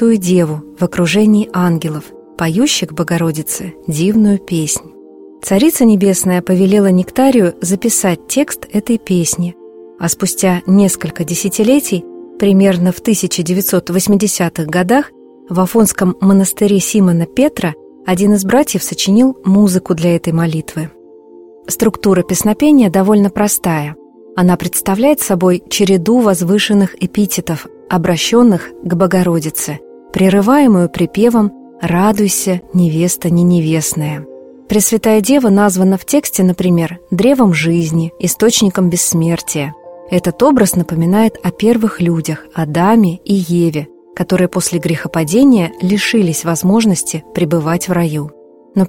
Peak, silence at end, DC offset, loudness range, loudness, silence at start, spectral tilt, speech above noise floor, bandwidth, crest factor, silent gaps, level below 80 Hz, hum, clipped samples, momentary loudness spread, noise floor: 0 dBFS; 0 s; under 0.1%; 2 LU; -13 LUFS; 0 s; -5.5 dB/octave; 26 dB; 16.5 kHz; 12 dB; none; -46 dBFS; none; under 0.1%; 9 LU; -38 dBFS